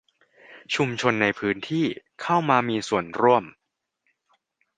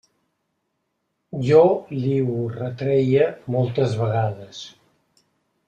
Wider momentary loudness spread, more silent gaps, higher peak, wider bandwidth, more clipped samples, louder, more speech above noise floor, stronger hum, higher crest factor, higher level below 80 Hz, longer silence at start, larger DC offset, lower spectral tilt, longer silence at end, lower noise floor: second, 8 LU vs 20 LU; neither; about the same, -2 dBFS vs -2 dBFS; about the same, 9.6 kHz vs 8.8 kHz; neither; about the same, -23 LUFS vs -21 LUFS; about the same, 52 dB vs 55 dB; neither; about the same, 22 dB vs 20 dB; about the same, -64 dBFS vs -60 dBFS; second, 0.5 s vs 1.35 s; neither; second, -5.5 dB/octave vs -8 dB/octave; first, 1.3 s vs 1 s; about the same, -75 dBFS vs -75 dBFS